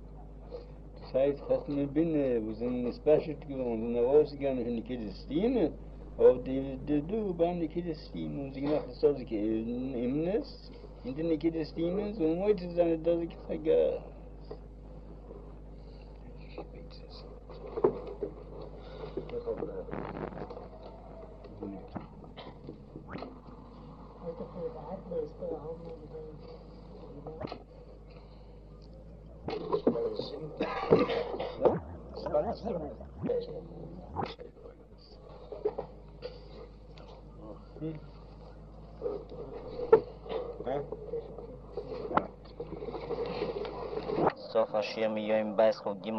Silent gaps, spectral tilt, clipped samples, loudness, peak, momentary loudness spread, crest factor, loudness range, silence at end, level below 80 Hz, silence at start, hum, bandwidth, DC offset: none; -8.5 dB/octave; under 0.1%; -33 LUFS; -8 dBFS; 22 LU; 26 dB; 14 LU; 0 s; -50 dBFS; 0 s; none; 6.2 kHz; under 0.1%